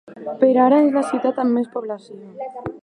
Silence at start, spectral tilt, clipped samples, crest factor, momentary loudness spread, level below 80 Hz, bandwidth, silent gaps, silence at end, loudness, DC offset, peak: 0.1 s; -7 dB/octave; under 0.1%; 16 dB; 19 LU; -62 dBFS; 10.5 kHz; none; 0.05 s; -18 LUFS; under 0.1%; -2 dBFS